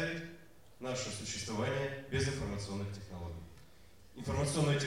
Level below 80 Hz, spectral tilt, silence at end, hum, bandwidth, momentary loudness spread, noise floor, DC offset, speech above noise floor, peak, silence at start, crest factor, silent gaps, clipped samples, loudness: -54 dBFS; -5 dB/octave; 0 s; none; 16 kHz; 16 LU; -61 dBFS; 0.1%; 25 dB; -20 dBFS; 0 s; 18 dB; none; under 0.1%; -38 LUFS